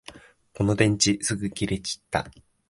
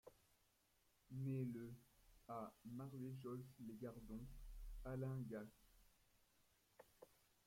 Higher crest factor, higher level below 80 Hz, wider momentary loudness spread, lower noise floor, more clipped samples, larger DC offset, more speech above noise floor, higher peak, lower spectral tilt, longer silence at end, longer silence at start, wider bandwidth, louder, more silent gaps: about the same, 22 dB vs 18 dB; first, -48 dBFS vs -66 dBFS; second, 10 LU vs 15 LU; second, -48 dBFS vs -81 dBFS; neither; neither; second, 24 dB vs 30 dB; first, -4 dBFS vs -36 dBFS; second, -4 dB/octave vs -8 dB/octave; about the same, 0.4 s vs 0.35 s; about the same, 0.1 s vs 0.05 s; second, 11.5 kHz vs 16.5 kHz; first, -25 LUFS vs -53 LUFS; neither